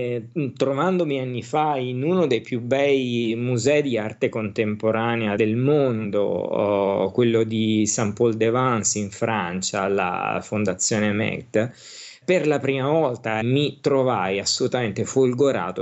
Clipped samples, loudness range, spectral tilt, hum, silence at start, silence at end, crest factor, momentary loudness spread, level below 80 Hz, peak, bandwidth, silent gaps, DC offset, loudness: under 0.1%; 2 LU; -5 dB/octave; none; 0 s; 0 s; 16 dB; 5 LU; -66 dBFS; -6 dBFS; 8.6 kHz; none; under 0.1%; -22 LUFS